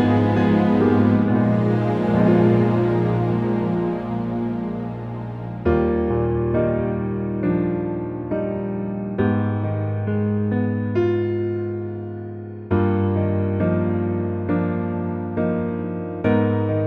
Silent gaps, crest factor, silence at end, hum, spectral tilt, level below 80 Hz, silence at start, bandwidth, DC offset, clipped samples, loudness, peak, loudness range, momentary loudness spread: none; 16 dB; 0 s; none; -10.5 dB/octave; -42 dBFS; 0 s; 5.4 kHz; under 0.1%; under 0.1%; -21 LUFS; -4 dBFS; 5 LU; 10 LU